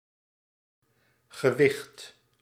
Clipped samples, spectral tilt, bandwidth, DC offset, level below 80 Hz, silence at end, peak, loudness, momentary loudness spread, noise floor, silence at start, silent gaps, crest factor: under 0.1%; -5.5 dB/octave; 15.5 kHz; under 0.1%; -76 dBFS; 0.35 s; -8 dBFS; -26 LUFS; 24 LU; -67 dBFS; 1.35 s; none; 24 dB